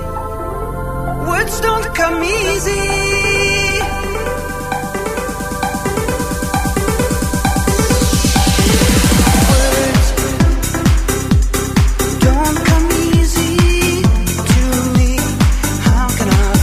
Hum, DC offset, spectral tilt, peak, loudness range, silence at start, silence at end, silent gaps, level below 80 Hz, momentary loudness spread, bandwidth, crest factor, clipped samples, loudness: none; under 0.1%; -4.5 dB/octave; 0 dBFS; 5 LU; 0 s; 0 s; none; -18 dBFS; 9 LU; 16 kHz; 12 dB; under 0.1%; -14 LUFS